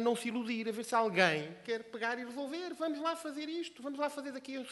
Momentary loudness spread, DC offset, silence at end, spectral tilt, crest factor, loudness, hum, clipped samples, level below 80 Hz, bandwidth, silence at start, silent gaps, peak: 11 LU; under 0.1%; 0 s; -4 dB/octave; 24 dB; -36 LUFS; none; under 0.1%; -84 dBFS; 12 kHz; 0 s; none; -10 dBFS